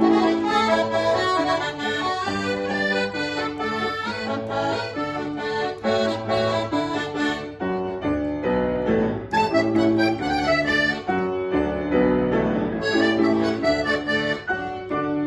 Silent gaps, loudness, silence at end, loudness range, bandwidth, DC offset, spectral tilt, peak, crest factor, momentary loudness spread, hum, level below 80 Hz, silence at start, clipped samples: none; -23 LUFS; 0 s; 4 LU; 12 kHz; under 0.1%; -5.5 dB/octave; -6 dBFS; 16 dB; 7 LU; none; -46 dBFS; 0 s; under 0.1%